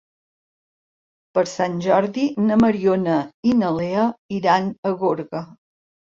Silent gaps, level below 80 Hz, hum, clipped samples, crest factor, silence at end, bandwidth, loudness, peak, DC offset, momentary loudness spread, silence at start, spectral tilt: 3.34-3.43 s, 4.18-4.29 s, 4.78-4.83 s; -56 dBFS; none; under 0.1%; 16 dB; 0.6 s; 7.8 kHz; -20 LUFS; -4 dBFS; under 0.1%; 7 LU; 1.35 s; -7 dB/octave